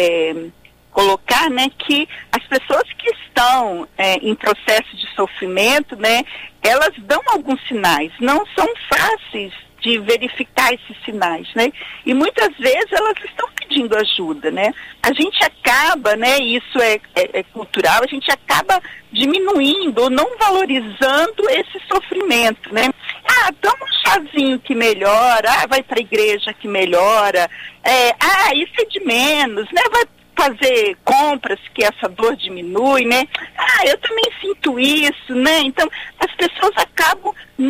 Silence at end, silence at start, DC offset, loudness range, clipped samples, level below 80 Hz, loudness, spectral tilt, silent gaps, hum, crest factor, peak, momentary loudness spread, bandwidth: 0 s; 0 s; under 0.1%; 3 LU; under 0.1%; -50 dBFS; -15 LUFS; -2 dB/octave; none; none; 14 dB; -2 dBFS; 8 LU; 16 kHz